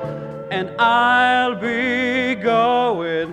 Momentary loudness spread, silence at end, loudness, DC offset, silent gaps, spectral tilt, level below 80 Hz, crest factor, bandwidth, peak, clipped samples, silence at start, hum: 11 LU; 0 s; -18 LUFS; under 0.1%; none; -5.5 dB/octave; -56 dBFS; 16 dB; 10 kHz; -4 dBFS; under 0.1%; 0 s; none